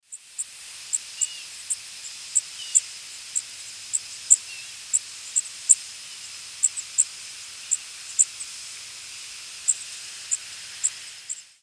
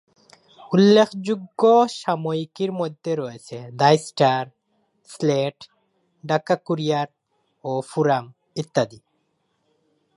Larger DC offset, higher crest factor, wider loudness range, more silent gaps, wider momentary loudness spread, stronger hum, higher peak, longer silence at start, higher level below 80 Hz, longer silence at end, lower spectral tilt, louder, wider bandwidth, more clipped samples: neither; first, 28 dB vs 20 dB; about the same, 4 LU vs 6 LU; neither; about the same, 17 LU vs 16 LU; neither; about the same, -2 dBFS vs -2 dBFS; second, 0.1 s vs 0.6 s; about the same, -76 dBFS vs -72 dBFS; second, 0.1 s vs 1.2 s; second, 4 dB/octave vs -6 dB/octave; second, -24 LUFS vs -21 LUFS; about the same, 11 kHz vs 11.5 kHz; neither